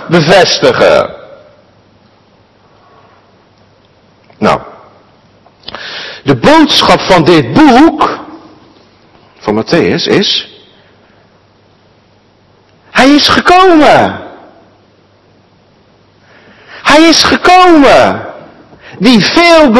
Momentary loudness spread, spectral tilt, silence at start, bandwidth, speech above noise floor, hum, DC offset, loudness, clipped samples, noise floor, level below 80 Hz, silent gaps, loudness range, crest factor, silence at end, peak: 16 LU; -4.5 dB/octave; 0 s; 12 kHz; 41 dB; none; under 0.1%; -6 LUFS; 5%; -46 dBFS; -38 dBFS; none; 12 LU; 10 dB; 0 s; 0 dBFS